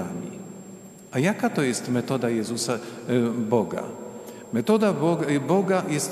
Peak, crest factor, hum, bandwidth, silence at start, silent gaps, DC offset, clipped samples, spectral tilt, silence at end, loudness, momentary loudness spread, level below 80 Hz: -6 dBFS; 18 dB; none; 15 kHz; 0 s; none; under 0.1%; under 0.1%; -5.5 dB/octave; 0 s; -24 LUFS; 17 LU; -70 dBFS